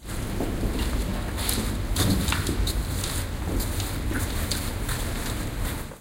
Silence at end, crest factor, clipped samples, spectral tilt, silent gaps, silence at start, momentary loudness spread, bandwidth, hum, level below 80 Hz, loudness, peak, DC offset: 0 s; 20 dB; under 0.1%; -4 dB/octave; none; 0 s; 6 LU; 17 kHz; none; -30 dBFS; -28 LUFS; -6 dBFS; under 0.1%